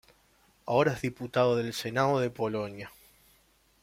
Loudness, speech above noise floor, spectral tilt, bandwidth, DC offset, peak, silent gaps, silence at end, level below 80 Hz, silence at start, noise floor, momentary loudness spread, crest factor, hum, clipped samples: -29 LUFS; 37 dB; -6 dB/octave; 16.5 kHz; under 0.1%; -12 dBFS; none; 0.95 s; -64 dBFS; 0.65 s; -66 dBFS; 15 LU; 20 dB; none; under 0.1%